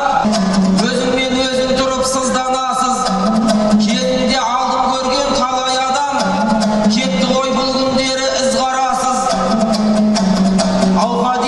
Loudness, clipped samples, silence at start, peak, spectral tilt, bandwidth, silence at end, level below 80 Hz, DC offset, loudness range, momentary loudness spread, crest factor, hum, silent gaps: -14 LUFS; under 0.1%; 0 s; 0 dBFS; -4.5 dB/octave; 12 kHz; 0 s; -38 dBFS; under 0.1%; 1 LU; 2 LU; 14 dB; none; none